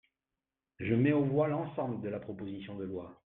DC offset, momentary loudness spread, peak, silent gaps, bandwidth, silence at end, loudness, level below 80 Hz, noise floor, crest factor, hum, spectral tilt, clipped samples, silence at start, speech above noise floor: under 0.1%; 14 LU; -16 dBFS; none; 4 kHz; 0.1 s; -33 LUFS; -66 dBFS; under -90 dBFS; 18 dB; none; -11.5 dB/octave; under 0.1%; 0.8 s; over 57 dB